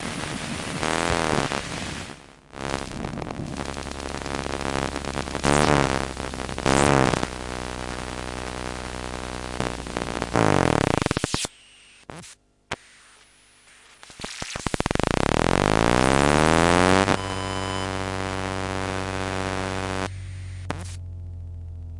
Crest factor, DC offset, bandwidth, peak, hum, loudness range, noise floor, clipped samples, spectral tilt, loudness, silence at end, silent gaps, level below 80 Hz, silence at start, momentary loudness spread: 26 dB; under 0.1%; 11.5 kHz; 0 dBFS; none; 10 LU; -55 dBFS; under 0.1%; -4.5 dB/octave; -25 LUFS; 0 s; none; -40 dBFS; 0 s; 17 LU